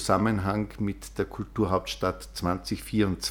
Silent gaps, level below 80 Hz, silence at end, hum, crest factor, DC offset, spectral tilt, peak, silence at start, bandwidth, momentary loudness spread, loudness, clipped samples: none; -46 dBFS; 0 s; none; 20 dB; under 0.1%; -5.5 dB/octave; -8 dBFS; 0 s; 19.5 kHz; 8 LU; -29 LUFS; under 0.1%